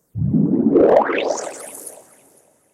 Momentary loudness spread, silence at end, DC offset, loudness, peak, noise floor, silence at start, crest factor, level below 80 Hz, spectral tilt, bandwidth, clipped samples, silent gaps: 20 LU; 0.85 s; under 0.1%; -17 LUFS; -2 dBFS; -55 dBFS; 0.15 s; 16 dB; -48 dBFS; -6.5 dB/octave; 15 kHz; under 0.1%; none